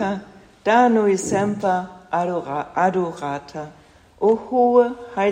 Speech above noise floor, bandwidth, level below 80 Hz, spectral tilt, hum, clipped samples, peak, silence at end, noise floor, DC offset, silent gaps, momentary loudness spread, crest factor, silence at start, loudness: 20 dB; 10.5 kHz; -60 dBFS; -5.5 dB/octave; none; under 0.1%; -4 dBFS; 0 s; -39 dBFS; under 0.1%; none; 13 LU; 16 dB; 0 s; -20 LUFS